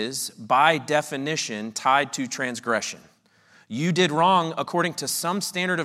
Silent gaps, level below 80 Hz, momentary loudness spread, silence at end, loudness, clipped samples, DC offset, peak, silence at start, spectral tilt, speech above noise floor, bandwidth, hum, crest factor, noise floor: none; -78 dBFS; 9 LU; 0 s; -23 LUFS; under 0.1%; under 0.1%; -4 dBFS; 0 s; -3.5 dB/octave; 34 dB; 16 kHz; none; 20 dB; -58 dBFS